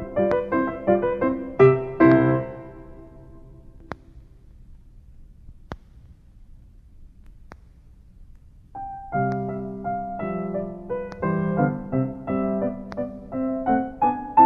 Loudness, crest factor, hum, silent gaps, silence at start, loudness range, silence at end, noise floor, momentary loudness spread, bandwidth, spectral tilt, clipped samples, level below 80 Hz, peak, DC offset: -23 LUFS; 22 dB; none; none; 0 s; 24 LU; 0 s; -49 dBFS; 23 LU; 5.8 kHz; -10.5 dB/octave; under 0.1%; -48 dBFS; -4 dBFS; under 0.1%